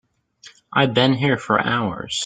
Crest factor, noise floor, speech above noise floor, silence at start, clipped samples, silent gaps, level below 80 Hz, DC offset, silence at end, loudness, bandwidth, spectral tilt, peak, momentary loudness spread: 20 dB; -49 dBFS; 30 dB; 0.45 s; under 0.1%; none; -56 dBFS; under 0.1%; 0 s; -19 LUFS; 9.4 kHz; -5 dB/octave; -2 dBFS; 7 LU